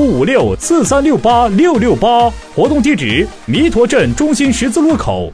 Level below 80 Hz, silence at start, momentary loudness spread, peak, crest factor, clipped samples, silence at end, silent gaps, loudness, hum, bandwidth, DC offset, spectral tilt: -30 dBFS; 0 s; 4 LU; 0 dBFS; 10 dB; under 0.1%; 0 s; none; -12 LUFS; none; 11 kHz; under 0.1%; -5 dB/octave